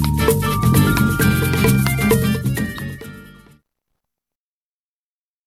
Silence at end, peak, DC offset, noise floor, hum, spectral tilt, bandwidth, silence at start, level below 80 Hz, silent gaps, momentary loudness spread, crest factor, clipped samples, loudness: 2.15 s; -2 dBFS; under 0.1%; under -90 dBFS; none; -5.5 dB/octave; 17 kHz; 0 s; -32 dBFS; none; 14 LU; 18 dB; under 0.1%; -17 LUFS